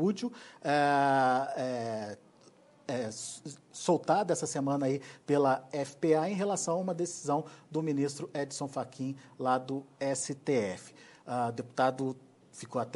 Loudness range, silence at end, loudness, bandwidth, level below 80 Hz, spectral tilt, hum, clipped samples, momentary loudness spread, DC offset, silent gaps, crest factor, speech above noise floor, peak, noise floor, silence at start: 4 LU; 0 s; -32 LUFS; 11.5 kHz; -78 dBFS; -5 dB/octave; none; under 0.1%; 12 LU; under 0.1%; none; 18 dB; 29 dB; -14 dBFS; -60 dBFS; 0 s